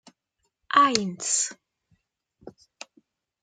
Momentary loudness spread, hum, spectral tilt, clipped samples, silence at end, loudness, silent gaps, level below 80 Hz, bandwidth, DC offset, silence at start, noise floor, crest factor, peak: 26 LU; none; -1.5 dB/octave; under 0.1%; 0.95 s; -23 LUFS; none; -70 dBFS; 9.6 kHz; under 0.1%; 0.7 s; -78 dBFS; 28 dB; -2 dBFS